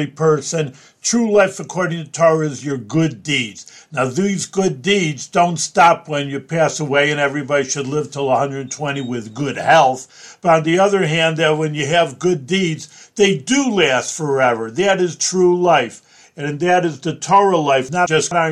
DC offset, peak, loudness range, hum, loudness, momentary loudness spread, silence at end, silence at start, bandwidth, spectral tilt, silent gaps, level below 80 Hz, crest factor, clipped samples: under 0.1%; 0 dBFS; 3 LU; none; -17 LUFS; 10 LU; 0 s; 0 s; 12.5 kHz; -4 dB/octave; none; -60 dBFS; 16 dB; under 0.1%